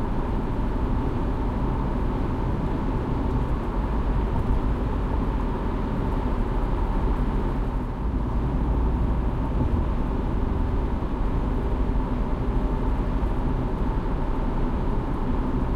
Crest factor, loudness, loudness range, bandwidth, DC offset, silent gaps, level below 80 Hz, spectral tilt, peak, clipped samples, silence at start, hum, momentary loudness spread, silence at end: 12 dB; -27 LUFS; 1 LU; 5.2 kHz; under 0.1%; none; -26 dBFS; -9 dB/octave; -10 dBFS; under 0.1%; 0 s; none; 2 LU; 0 s